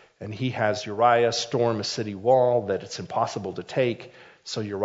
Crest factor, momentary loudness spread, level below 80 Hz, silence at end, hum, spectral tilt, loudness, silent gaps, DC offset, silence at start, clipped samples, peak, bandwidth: 18 dB; 13 LU; -70 dBFS; 0 s; none; -5 dB/octave; -25 LUFS; none; under 0.1%; 0.2 s; under 0.1%; -6 dBFS; 7.8 kHz